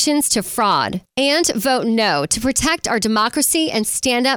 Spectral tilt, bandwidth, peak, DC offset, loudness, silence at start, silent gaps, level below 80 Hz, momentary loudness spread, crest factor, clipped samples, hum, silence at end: -2.5 dB/octave; over 20 kHz; -4 dBFS; under 0.1%; -17 LUFS; 0 s; none; -44 dBFS; 3 LU; 14 dB; under 0.1%; none; 0 s